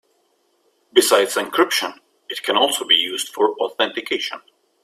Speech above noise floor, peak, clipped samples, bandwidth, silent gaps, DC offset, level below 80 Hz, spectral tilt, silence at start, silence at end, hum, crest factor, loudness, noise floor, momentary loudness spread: 45 dB; 0 dBFS; under 0.1%; 16 kHz; none; under 0.1%; -68 dBFS; -0.5 dB/octave; 0.95 s; 0.45 s; none; 20 dB; -19 LUFS; -64 dBFS; 12 LU